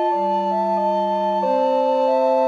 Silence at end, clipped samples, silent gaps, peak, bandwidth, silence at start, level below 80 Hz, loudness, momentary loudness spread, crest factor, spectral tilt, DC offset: 0 s; under 0.1%; none; -8 dBFS; 7.4 kHz; 0 s; -88 dBFS; -19 LUFS; 3 LU; 10 dB; -7 dB/octave; under 0.1%